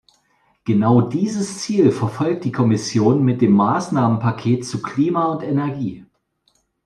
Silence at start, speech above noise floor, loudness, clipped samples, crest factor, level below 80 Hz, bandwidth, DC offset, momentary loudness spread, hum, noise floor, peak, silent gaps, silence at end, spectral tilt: 0.65 s; 47 dB; -18 LUFS; under 0.1%; 16 dB; -58 dBFS; 11.5 kHz; under 0.1%; 8 LU; none; -65 dBFS; -2 dBFS; none; 0.85 s; -7 dB/octave